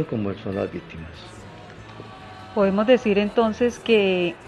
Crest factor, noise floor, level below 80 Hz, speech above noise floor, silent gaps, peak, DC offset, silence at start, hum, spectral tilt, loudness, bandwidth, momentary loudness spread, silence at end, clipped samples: 18 dB; -41 dBFS; -52 dBFS; 19 dB; none; -4 dBFS; under 0.1%; 0 s; none; -6.5 dB/octave; -21 LUFS; 11 kHz; 22 LU; 0 s; under 0.1%